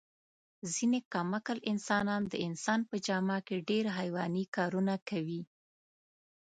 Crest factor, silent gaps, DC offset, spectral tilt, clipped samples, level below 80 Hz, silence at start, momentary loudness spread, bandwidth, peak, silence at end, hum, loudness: 18 dB; 1.05-1.11 s, 4.48-4.53 s, 5.02-5.06 s; under 0.1%; -5 dB/octave; under 0.1%; -76 dBFS; 0.65 s; 6 LU; 9.4 kHz; -16 dBFS; 1.15 s; none; -34 LUFS